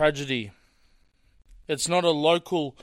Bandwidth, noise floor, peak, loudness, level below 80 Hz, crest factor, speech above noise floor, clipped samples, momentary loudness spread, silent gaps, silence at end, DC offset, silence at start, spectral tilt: 16 kHz; -61 dBFS; -6 dBFS; -25 LUFS; -58 dBFS; 20 dB; 37 dB; under 0.1%; 10 LU; none; 0.1 s; under 0.1%; 0 s; -4 dB/octave